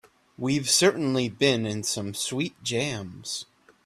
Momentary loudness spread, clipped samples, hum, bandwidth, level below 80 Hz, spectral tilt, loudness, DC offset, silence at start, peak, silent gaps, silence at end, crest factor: 13 LU; under 0.1%; none; 15.5 kHz; -64 dBFS; -3.5 dB/octave; -26 LUFS; under 0.1%; 0.4 s; -8 dBFS; none; 0.45 s; 20 dB